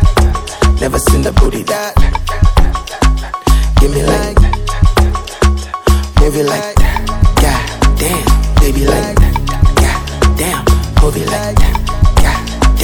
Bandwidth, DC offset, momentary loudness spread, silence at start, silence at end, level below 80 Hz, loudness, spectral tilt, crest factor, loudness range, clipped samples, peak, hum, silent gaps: 19.5 kHz; under 0.1%; 3 LU; 0 s; 0 s; -12 dBFS; -13 LUFS; -5 dB/octave; 10 dB; 1 LU; 2%; 0 dBFS; none; none